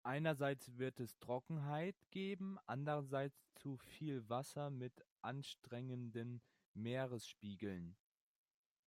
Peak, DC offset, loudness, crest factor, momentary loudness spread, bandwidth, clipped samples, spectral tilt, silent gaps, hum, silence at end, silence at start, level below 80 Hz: -28 dBFS; under 0.1%; -47 LUFS; 18 dB; 10 LU; 16 kHz; under 0.1%; -6.5 dB/octave; 5.11-5.17 s, 6.66-6.75 s; none; 0.95 s; 0.05 s; -84 dBFS